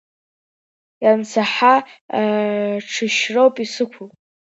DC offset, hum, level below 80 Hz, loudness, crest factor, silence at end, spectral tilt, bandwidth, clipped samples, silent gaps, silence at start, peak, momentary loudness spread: under 0.1%; none; -74 dBFS; -18 LUFS; 18 dB; 0.45 s; -4 dB/octave; 8 kHz; under 0.1%; 2.01-2.09 s; 1 s; -2 dBFS; 9 LU